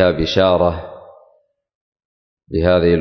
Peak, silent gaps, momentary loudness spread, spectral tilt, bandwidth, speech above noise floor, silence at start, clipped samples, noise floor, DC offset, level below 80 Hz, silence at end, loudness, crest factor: -2 dBFS; 1.75-1.92 s, 2.05-2.37 s; 15 LU; -7 dB/octave; 6.4 kHz; 43 dB; 0 s; under 0.1%; -58 dBFS; under 0.1%; -34 dBFS; 0 s; -16 LUFS; 16 dB